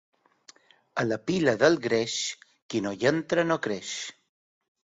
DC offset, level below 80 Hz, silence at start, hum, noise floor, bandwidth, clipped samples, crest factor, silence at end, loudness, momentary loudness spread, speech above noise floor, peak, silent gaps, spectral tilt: under 0.1%; -66 dBFS; 0.95 s; none; -57 dBFS; 8 kHz; under 0.1%; 22 dB; 0.85 s; -27 LUFS; 13 LU; 31 dB; -6 dBFS; 2.62-2.69 s; -4 dB/octave